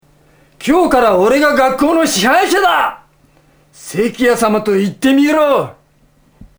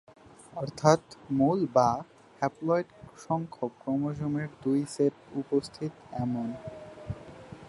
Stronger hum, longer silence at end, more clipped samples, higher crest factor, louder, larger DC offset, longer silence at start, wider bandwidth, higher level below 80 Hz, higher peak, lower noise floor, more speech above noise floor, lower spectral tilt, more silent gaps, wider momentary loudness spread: neither; first, 0.15 s vs 0 s; neither; second, 14 dB vs 24 dB; first, -12 LUFS vs -30 LUFS; neither; about the same, 0.6 s vs 0.55 s; first, over 20 kHz vs 11.5 kHz; first, -44 dBFS vs -60 dBFS; first, 0 dBFS vs -6 dBFS; first, -52 dBFS vs -47 dBFS; first, 40 dB vs 18 dB; second, -4 dB/octave vs -7 dB/octave; neither; second, 8 LU vs 18 LU